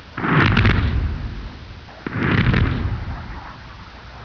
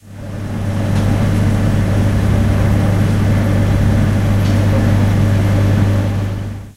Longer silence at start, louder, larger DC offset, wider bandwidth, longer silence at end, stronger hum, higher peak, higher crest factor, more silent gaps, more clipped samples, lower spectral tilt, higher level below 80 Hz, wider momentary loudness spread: about the same, 0 s vs 0.05 s; second, -19 LUFS vs -15 LUFS; neither; second, 5.4 kHz vs 13.5 kHz; about the same, 0 s vs 0.05 s; second, none vs 50 Hz at -15 dBFS; about the same, -2 dBFS vs 0 dBFS; first, 20 dB vs 12 dB; neither; neither; about the same, -7.5 dB/octave vs -7.5 dB/octave; about the same, -28 dBFS vs -24 dBFS; first, 22 LU vs 7 LU